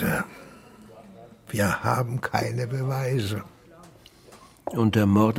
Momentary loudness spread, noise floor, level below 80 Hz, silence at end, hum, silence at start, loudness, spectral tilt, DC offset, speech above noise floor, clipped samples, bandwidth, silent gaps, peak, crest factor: 25 LU; -51 dBFS; -56 dBFS; 0 s; none; 0 s; -26 LUFS; -6.5 dB/octave; under 0.1%; 27 dB; under 0.1%; 17 kHz; none; -6 dBFS; 20 dB